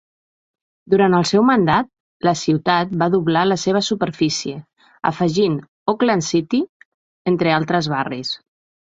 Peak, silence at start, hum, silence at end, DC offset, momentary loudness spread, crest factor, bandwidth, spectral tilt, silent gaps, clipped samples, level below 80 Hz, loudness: -2 dBFS; 0.9 s; none; 0.55 s; under 0.1%; 10 LU; 16 dB; 8.2 kHz; -5.5 dB/octave; 2.00-2.20 s, 5.68-5.86 s, 6.69-7.25 s; under 0.1%; -56 dBFS; -18 LUFS